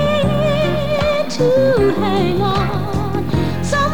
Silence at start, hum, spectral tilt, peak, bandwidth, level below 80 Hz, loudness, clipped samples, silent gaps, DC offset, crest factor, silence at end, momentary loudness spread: 0 s; none; -6.5 dB/octave; -4 dBFS; 19 kHz; -32 dBFS; -17 LUFS; under 0.1%; none; 4%; 12 dB; 0 s; 6 LU